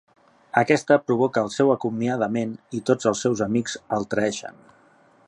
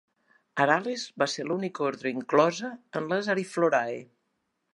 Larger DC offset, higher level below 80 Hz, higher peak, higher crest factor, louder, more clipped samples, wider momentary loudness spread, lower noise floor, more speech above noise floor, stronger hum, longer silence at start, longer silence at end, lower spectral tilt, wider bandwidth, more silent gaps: neither; first, -62 dBFS vs -82 dBFS; about the same, -4 dBFS vs -6 dBFS; about the same, 20 dB vs 22 dB; first, -23 LUFS vs -28 LUFS; neither; about the same, 9 LU vs 11 LU; second, -56 dBFS vs -78 dBFS; second, 34 dB vs 51 dB; neither; about the same, 0.55 s vs 0.55 s; about the same, 0.75 s vs 0.7 s; about the same, -5.5 dB/octave vs -4.5 dB/octave; about the same, 11 kHz vs 11.5 kHz; neither